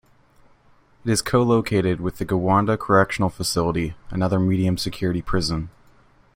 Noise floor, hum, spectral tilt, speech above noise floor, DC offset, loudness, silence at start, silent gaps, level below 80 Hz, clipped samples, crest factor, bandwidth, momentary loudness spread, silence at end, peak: -55 dBFS; none; -5.5 dB/octave; 34 dB; under 0.1%; -22 LUFS; 1.05 s; none; -42 dBFS; under 0.1%; 20 dB; 16.5 kHz; 8 LU; 0.65 s; -2 dBFS